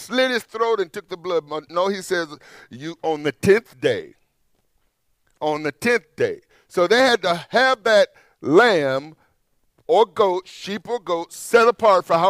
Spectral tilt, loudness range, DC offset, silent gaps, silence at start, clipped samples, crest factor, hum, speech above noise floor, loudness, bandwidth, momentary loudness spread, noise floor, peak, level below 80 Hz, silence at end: -4 dB/octave; 6 LU; under 0.1%; none; 0 s; under 0.1%; 18 dB; none; 48 dB; -20 LUFS; 16 kHz; 13 LU; -68 dBFS; -2 dBFS; -64 dBFS; 0 s